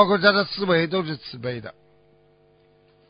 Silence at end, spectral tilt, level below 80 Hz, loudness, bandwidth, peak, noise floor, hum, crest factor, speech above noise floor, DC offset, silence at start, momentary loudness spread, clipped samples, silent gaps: 1.4 s; -10 dB/octave; -62 dBFS; -22 LUFS; 5.2 kHz; -2 dBFS; -58 dBFS; 50 Hz at -55 dBFS; 22 dB; 36 dB; under 0.1%; 0 s; 16 LU; under 0.1%; none